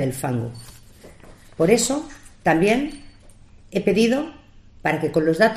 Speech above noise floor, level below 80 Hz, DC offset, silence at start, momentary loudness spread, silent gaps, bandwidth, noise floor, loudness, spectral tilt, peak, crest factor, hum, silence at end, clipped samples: 27 dB; -48 dBFS; under 0.1%; 0 s; 17 LU; none; 15.5 kHz; -47 dBFS; -21 LUFS; -5 dB/octave; -2 dBFS; 20 dB; none; 0 s; under 0.1%